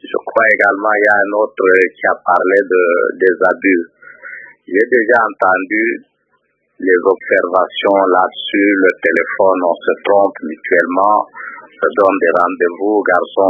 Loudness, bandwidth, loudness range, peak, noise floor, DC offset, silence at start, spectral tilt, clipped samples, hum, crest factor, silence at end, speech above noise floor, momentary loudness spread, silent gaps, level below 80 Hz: -13 LUFS; 6.2 kHz; 3 LU; 0 dBFS; -62 dBFS; under 0.1%; 0.05 s; -6 dB/octave; under 0.1%; none; 14 dB; 0 s; 49 dB; 7 LU; none; -64 dBFS